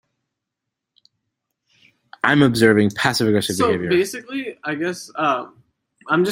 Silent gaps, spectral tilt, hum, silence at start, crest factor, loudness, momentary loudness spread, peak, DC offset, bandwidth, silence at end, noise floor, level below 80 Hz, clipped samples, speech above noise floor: none; -5 dB/octave; none; 2.25 s; 20 dB; -19 LUFS; 12 LU; -2 dBFS; under 0.1%; 16 kHz; 0 s; -82 dBFS; -58 dBFS; under 0.1%; 64 dB